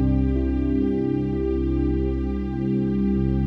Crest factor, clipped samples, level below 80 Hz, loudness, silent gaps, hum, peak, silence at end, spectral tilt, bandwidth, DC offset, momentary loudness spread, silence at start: 12 dB; under 0.1%; -28 dBFS; -23 LUFS; none; none; -10 dBFS; 0 s; -11 dB/octave; 5 kHz; under 0.1%; 3 LU; 0 s